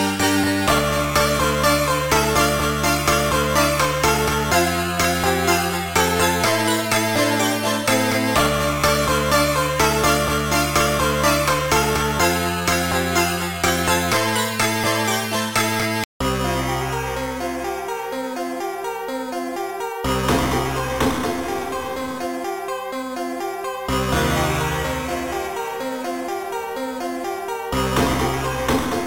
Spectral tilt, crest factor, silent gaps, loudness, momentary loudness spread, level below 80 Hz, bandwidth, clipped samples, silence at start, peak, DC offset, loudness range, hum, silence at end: -3.5 dB/octave; 18 dB; 16.05-16.20 s; -20 LUFS; 9 LU; -36 dBFS; 17 kHz; under 0.1%; 0 s; -4 dBFS; under 0.1%; 7 LU; none; 0 s